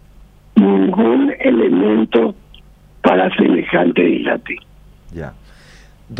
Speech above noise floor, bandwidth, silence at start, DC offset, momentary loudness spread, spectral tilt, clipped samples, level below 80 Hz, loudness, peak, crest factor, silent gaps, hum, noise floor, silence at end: 29 dB; 5.8 kHz; 0.55 s; under 0.1%; 17 LU; -8.5 dB/octave; under 0.1%; -46 dBFS; -14 LUFS; 0 dBFS; 16 dB; none; none; -44 dBFS; 0 s